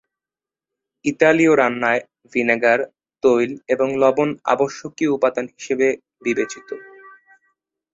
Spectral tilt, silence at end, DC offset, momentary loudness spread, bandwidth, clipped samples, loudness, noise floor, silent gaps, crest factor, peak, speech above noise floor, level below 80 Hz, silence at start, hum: -5 dB/octave; 0.85 s; under 0.1%; 11 LU; 8 kHz; under 0.1%; -19 LUFS; under -90 dBFS; none; 20 dB; -2 dBFS; over 72 dB; -64 dBFS; 1.05 s; none